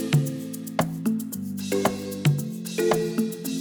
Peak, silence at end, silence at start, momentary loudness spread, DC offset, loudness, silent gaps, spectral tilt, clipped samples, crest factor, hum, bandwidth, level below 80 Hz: -6 dBFS; 0 s; 0 s; 7 LU; under 0.1%; -26 LUFS; none; -6 dB/octave; under 0.1%; 20 dB; none; over 20 kHz; -60 dBFS